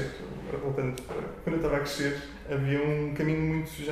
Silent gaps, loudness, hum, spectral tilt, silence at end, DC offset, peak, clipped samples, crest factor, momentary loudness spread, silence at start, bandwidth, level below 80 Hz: none; -31 LUFS; none; -6.5 dB/octave; 0 s; under 0.1%; -16 dBFS; under 0.1%; 14 dB; 9 LU; 0 s; 15.5 kHz; -48 dBFS